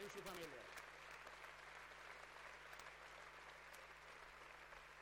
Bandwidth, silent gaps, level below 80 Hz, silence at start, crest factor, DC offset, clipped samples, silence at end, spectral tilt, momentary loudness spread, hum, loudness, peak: 16 kHz; none; -76 dBFS; 0 s; 18 dB; under 0.1%; under 0.1%; 0 s; -2.5 dB/octave; 6 LU; none; -57 LUFS; -40 dBFS